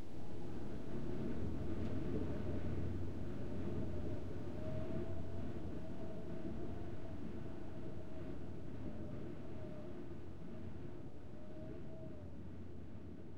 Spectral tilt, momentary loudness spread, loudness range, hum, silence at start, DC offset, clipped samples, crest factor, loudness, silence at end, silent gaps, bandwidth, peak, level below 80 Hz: -8.5 dB/octave; 9 LU; 7 LU; none; 0 s; 0.9%; under 0.1%; 14 dB; -47 LUFS; 0 s; none; 11.5 kHz; -28 dBFS; -56 dBFS